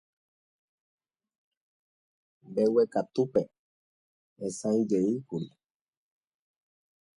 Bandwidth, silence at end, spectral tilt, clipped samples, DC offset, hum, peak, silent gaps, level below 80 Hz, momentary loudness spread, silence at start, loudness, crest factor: 11.5 kHz; 1.7 s; -7 dB/octave; under 0.1%; under 0.1%; none; -12 dBFS; 3.59-4.36 s; -74 dBFS; 13 LU; 2.45 s; -29 LUFS; 20 dB